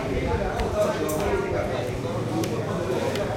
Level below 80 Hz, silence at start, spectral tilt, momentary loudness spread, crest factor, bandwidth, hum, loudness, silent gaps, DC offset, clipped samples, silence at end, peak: -38 dBFS; 0 s; -6 dB/octave; 3 LU; 14 dB; 16.5 kHz; none; -26 LUFS; none; under 0.1%; under 0.1%; 0 s; -12 dBFS